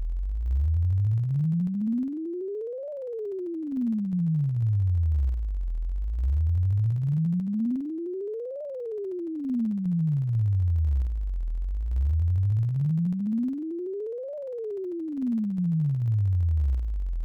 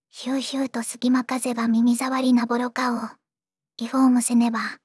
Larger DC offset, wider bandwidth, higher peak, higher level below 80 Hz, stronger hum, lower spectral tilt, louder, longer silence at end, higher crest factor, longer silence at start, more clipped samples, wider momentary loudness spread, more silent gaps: neither; second, 2.5 kHz vs 12 kHz; second, -20 dBFS vs -8 dBFS; first, -32 dBFS vs -86 dBFS; neither; first, -12 dB/octave vs -3.5 dB/octave; second, -28 LUFS vs -22 LUFS; about the same, 0 s vs 0.1 s; second, 6 dB vs 14 dB; second, 0 s vs 0.15 s; neither; about the same, 9 LU vs 8 LU; neither